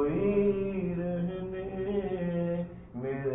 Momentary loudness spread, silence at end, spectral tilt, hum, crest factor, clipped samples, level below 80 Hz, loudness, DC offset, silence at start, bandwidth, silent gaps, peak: 10 LU; 0 s; -12 dB/octave; none; 16 dB; under 0.1%; -50 dBFS; -32 LUFS; under 0.1%; 0 s; 3.8 kHz; none; -16 dBFS